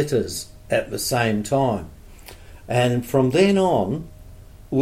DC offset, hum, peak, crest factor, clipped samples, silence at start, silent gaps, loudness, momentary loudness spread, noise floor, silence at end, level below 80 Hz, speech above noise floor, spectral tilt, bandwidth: under 0.1%; none; -6 dBFS; 16 dB; under 0.1%; 0 s; none; -21 LUFS; 13 LU; -42 dBFS; 0 s; -44 dBFS; 22 dB; -5.5 dB/octave; 16.5 kHz